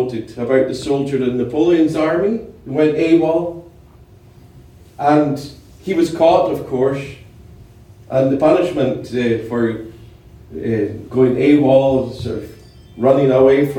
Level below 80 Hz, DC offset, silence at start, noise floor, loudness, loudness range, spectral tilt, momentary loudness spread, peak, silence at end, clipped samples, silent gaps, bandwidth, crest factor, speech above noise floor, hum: -46 dBFS; under 0.1%; 0 s; -44 dBFS; -16 LUFS; 3 LU; -7.5 dB/octave; 14 LU; -2 dBFS; 0 s; under 0.1%; none; 15 kHz; 16 dB; 29 dB; none